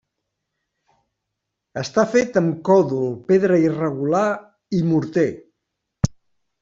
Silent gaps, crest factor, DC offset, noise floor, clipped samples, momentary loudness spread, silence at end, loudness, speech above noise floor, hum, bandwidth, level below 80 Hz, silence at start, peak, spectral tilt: none; 18 dB; under 0.1%; -80 dBFS; under 0.1%; 9 LU; 0.5 s; -20 LUFS; 61 dB; none; 7.6 kHz; -50 dBFS; 1.75 s; -4 dBFS; -7 dB/octave